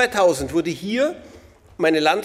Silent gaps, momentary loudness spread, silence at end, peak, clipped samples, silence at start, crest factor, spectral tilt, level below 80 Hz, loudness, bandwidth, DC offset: none; 7 LU; 0 s; -4 dBFS; under 0.1%; 0 s; 16 dB; -4 dB/octave; -50 dBFS; -20 LUFS; 16 kHz; under 0.1%